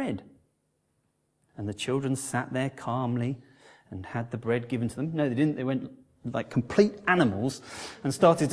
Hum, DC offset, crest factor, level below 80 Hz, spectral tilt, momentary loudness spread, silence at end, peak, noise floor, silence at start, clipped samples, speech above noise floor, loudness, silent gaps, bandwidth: none; under 0.1%; 22 dB; -64 dBFS; -6 dB/octave; 15 LU; 0 s; -6 dBFS; -74 dBFS; 0 s; under 0.1%; 46 dB; -28 LUFS; none; 11 kHz